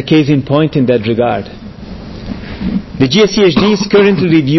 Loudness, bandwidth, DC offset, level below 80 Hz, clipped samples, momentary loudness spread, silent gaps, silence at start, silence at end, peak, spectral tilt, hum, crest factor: -11 LUFS; 6.2 kHz; under 0.1%; -34 dBFS; under 0.1%; 19 LU; none; 0 s; 0 s; 0 dBFS; -6.5 dB/octave; none; 12 dB